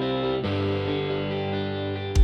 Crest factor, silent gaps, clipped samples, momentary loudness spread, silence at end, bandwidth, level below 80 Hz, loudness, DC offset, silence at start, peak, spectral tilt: 16 dB; none; under 0.1%; 3 LU; 0 s; 10 kHz; -34 dBFS; -27 LUFS; under 0.1%; 0 s; -8 dBFS; -6.5 dB/octave